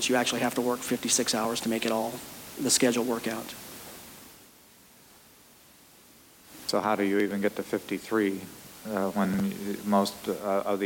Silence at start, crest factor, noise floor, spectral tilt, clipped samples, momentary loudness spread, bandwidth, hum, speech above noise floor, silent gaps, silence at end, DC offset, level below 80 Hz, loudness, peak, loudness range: 0 s; 20 dB; -56 dBFS; -3.5 dB/octave; under 0.1%; 18 LU; 17 kHz; none; 28 dB; none; 0 s; under 0.1%; -66 dBFS; -28 LUFS; -10 dBFS; 11 LU